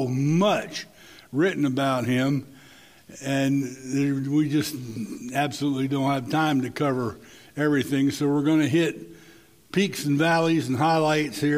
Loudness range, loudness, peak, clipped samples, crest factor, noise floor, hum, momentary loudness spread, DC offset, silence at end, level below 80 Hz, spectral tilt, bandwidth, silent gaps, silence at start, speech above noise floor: 3 LU; -24 LUFS; -8 dBFS; under 0.1%; 16 dB; -52 dBFS; none; 12 LU; under 0.1%; 0 s; -64 dBFS; -6 dB/octave; 16 kHz; none; 0 s; 29 dB